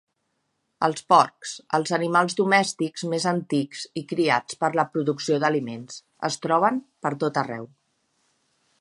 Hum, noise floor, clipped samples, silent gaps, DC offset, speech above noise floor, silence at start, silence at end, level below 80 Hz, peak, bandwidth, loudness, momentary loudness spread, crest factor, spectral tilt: none; -75 dBFS; under 0.1%; none; under 0.1%; 51 dB; 0.8 s; 1.15 s; -74 dBFS; -2 dBFS; 11.5 kHz; -24 LUFS; 13 LU; 22 dB; -4.5 dB/octave